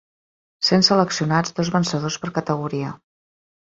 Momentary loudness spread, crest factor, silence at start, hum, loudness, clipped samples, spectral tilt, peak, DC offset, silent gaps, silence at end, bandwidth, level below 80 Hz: 11 LU; 20 dB; 0.6 s; none; -20 LUFS; under 0.1%; -4.5 dB/octave; -2 dBFS; under 0.1%; none; 0.75 s; 7.8 kHz; -58 dBFS